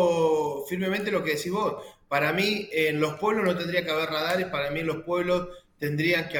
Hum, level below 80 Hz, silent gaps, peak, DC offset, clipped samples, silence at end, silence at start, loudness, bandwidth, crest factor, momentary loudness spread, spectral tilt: none; -58 dBFS; none; -10 dBFS; under 0.1%; under 0.1%; 0 s; 0 s; -26 LUFS; 19 kHz; 16 dB; 6 LU; -5 dB/octave